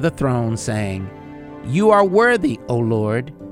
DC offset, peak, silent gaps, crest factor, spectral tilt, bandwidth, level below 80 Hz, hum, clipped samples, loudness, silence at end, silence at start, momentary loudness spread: under 0.1%; -2 dBFS; none; 18 dB; -6.5 dB/octave; 13 kHz; -46 dBFS; none; under 0.1%; -18 LUFS; 0 s; 0 s; 19 LU